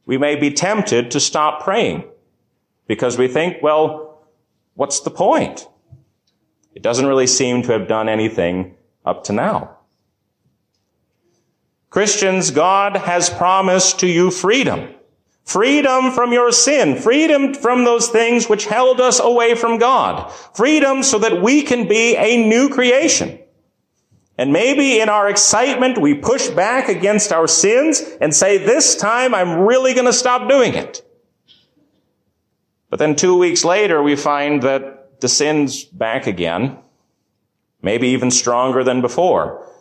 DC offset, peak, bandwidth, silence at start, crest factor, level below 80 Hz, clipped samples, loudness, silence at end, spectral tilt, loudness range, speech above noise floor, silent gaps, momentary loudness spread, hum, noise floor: under 0.1%; -2 dBFS; 12.5 kHz; 0.05 s; 14 dB; -54 dBFS; under 0.1%; -15 LUFS; 0.15 s; -3 dB/octave; 7 LU; 55 dB; none; 10 LU; none; -70 dBFS